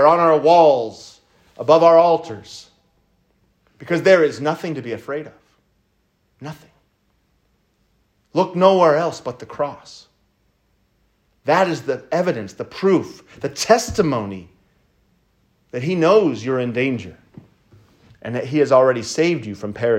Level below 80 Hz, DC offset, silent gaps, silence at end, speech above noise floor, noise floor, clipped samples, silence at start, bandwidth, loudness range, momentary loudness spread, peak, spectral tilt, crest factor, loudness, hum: -56 dBFS; under 0.1%; none; 0 s; 48 dB; -65 dBFS; under 0.1%; 0 s; 15.5 kHz; 7 LU; 22 LU; 0 dBFS; -5.5 dB/octave; 18 dB; -18 LUFS; none